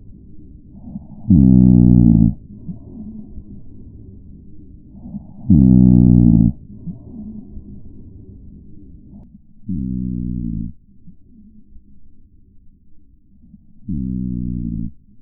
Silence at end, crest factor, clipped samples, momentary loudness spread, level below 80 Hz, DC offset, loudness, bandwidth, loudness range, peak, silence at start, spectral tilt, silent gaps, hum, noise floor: 0.3 s; 18 dB; under 0.1%; 25 LU; -28 dBFS; under 0.1%; -14 LUFS; 1 kHz; 18 LU; 0 dBFS; 0.1 s; -18.5 dB/octave; none; none; -47 dBFS